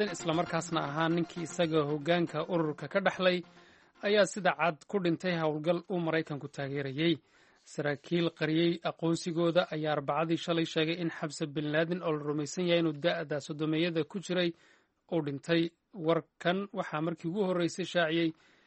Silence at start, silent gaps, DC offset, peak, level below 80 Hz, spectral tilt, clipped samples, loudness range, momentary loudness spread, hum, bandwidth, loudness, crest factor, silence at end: 0 s; none; under 0.1%; -12 dBFS; -74 dBFS; -5.5 dB/octave; under 0.1%; 2 LU; 7 LU; none; 8.4 kHz; -32 LUFS; 20 dB; 0.35 s